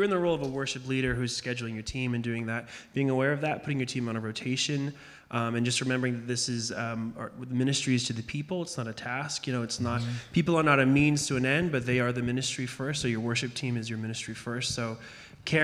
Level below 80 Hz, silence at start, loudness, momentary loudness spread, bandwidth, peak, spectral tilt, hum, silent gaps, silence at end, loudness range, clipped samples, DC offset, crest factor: -56 dBFS; 0 s; -29 LUFS; 9 LU; 13.5 kHz; -8 dBFS; -4.5 dB/octave; none; none; 0 s; 5 LU; under 0.1%; under 0.1%; 22 dB